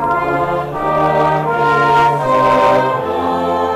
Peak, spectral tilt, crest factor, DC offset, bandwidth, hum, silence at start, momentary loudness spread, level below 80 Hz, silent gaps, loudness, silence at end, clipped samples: -6 dBFS; -6.5 dB/octave; 8 dB; under 0.1%; 15 kHz; none; 0 s; 6 LU; -42 dBFS; none; -14 LUFS; 0 s; under 0.1%